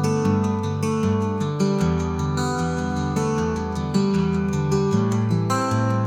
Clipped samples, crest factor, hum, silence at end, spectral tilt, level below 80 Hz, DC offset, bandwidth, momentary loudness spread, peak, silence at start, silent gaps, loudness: under 0.1%; 14 dB; none; 0 s; -7 dB/octave; -44 dBFS; under 0.1%; 14.5 kHz; 3 LU; -8 dBFS; 0 s; none; -22 LUFS